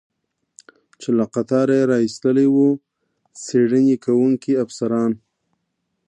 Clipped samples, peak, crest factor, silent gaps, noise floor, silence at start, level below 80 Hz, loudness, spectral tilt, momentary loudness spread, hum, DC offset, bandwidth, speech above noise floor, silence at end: under 0.1%; -6 dBFS; 14 dB; none; -74 dBFS; 1 s; -68 dBFS; -18 LUFS; -7 dB/octave; 8 LU; none; under 0.1%; 9.6 kHz; 57 dB; 0.9 s